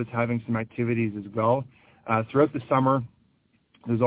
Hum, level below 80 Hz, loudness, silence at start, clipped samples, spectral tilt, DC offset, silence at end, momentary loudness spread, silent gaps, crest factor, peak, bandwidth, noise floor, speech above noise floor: none; -60 dBFS; -26 LUFS; 0 s; under 0.1%; -12 dB/octave; under 0.1%; 0 s; 17 LU; none; 18 dB; -8 dBFS; 4 kHz; -66 dBFS; 41 dB